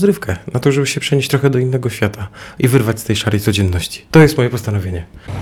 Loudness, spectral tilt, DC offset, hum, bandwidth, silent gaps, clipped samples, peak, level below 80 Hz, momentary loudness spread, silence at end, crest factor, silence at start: -15 LUFS; -6 dB/octave; under 0.1%; none; 18 kHz; none; under 0.1%; 0 dBFS; -38 dBFS; 10 LU; 0 s; 14 dB; 0 s